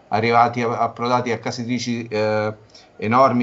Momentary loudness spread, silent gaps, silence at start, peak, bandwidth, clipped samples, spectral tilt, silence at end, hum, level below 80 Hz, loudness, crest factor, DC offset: 9 LU; none; 0.1 s; -4 dBFS; 8 kHz; under 0.1%; -6 dB/octave; 0 s; none; -62 dBFS; -20 LUFS; 16 dB; under 0.1%